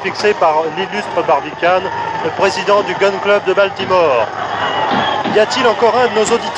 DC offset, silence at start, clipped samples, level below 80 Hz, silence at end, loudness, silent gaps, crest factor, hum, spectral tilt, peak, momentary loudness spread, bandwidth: under 0.1%; 0 s; under 0.1%; -52 dBFS; 0 s; -14 LUFS; none; 14 dB; none; -3.5 dB/octave; 0 dBFS; 6 LU; 10.5 kHz